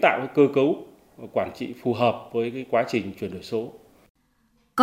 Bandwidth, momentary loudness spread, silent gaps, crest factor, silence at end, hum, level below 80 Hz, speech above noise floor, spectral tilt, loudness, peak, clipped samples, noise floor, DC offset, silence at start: 16 kHz; 12 LU; 4.10-4.15 s; 22 dB; 0 s; none; -66 dBFS; 41 dB; -6.5 dB/octave; -25 LUFS; -4 dBFS; under 0.1%; -65 dBFS; under 0.1%; 0 s